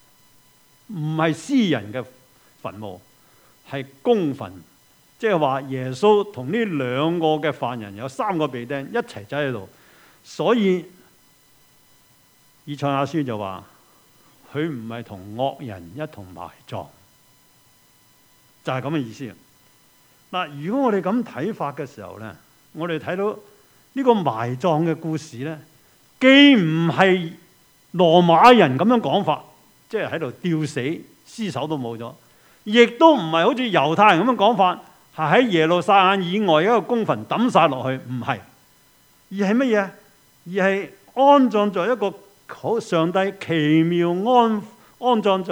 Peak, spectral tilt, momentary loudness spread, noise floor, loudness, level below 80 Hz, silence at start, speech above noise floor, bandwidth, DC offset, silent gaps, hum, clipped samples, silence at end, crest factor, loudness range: 0 dBFS; -6 dB/octave; 19 LU; -56 dBFS; -20 LUFS; -68 dBFS; 0.9 s; 36 dB; over 20 kHz; under 0.1%; none; none; under 0.1%; 0 s; 22 dB; 14 LU